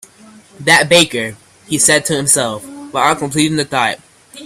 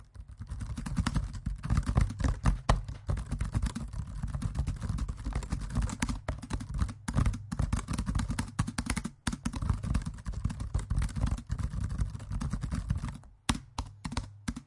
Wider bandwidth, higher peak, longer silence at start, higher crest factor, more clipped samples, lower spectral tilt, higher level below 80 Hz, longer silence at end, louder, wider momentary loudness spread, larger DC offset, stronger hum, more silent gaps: first, 16.5 kHz vs 11.5 kHz; first, 0 dBFS vs -8 dBFS; first, 0.6 s vs 0 s; second, 16 dB vs 24 dB; neither; second, -2.5 dB/octave vs -5.5 dB/octave; second, -52 dBFS vs -36 dBFS; about the same, 0 s vs 0 s; first, -13 LUFS vs -35 LUFS; first, 12 LU vs 8 LU; neither; neither; neither